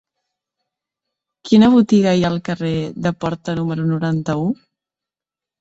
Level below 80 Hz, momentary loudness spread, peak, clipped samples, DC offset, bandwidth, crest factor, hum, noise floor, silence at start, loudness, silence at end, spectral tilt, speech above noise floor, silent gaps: -50 dBFS; 11 LU; -2 dBFS; under 0.1%; under 0.1%; 8 kHz; 18 dB; none; -89 dBFS; 1.45 s; -17 LUFS; 1.05 s; -7 dB/octave; 73 dB; none